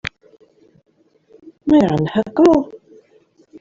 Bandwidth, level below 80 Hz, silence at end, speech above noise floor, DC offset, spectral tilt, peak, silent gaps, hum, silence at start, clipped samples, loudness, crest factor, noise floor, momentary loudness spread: 7.6 kHz; -50 dBFS; 0.85 s; 40 dB; under 0.1%; -7.5 dB/octave; -2 dBFS; none; none; 1.65 s; under 0.1%; -15 LUFS; 16 dB; -54 dBFS; 16 LU